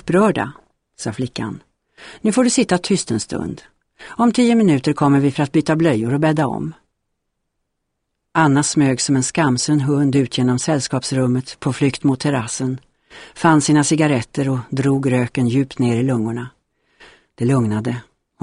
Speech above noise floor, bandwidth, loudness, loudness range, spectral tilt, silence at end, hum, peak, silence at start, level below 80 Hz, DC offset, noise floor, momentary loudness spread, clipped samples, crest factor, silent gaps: 57 dB; 11 kHz; -18 LUFS; 4 LU; -5.5 dB/octave; 0.4 s; none; -2 dBFS; 0.05 s; -52 dBFS; under 0.1%; -75 dBFS; 12 LU; under 0.1%; 16 dB; none